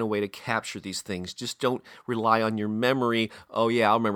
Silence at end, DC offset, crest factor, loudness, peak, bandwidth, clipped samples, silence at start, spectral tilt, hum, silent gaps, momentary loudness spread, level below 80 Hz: 0 s; under 0.1%; 20 dB; -27 LUFS; -6 dBFS; 18 kHz; under 0.1%; 0 s; -5 dB/octave; none; none; 11 LU; -68 dBFS